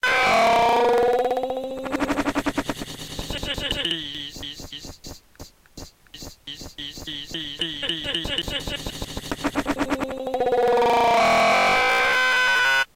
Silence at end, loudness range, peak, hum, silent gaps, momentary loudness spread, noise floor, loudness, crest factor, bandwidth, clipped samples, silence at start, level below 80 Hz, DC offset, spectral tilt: 0.1 s; 13 LU; -12 dBFS; none; none; 19 LU; -46 dBFS; -22 LUFS; 12 dB; 16.5 kHz; under 0.1%; 0.05 s; -44 dBFS; under 0.1%; -3 dB/octave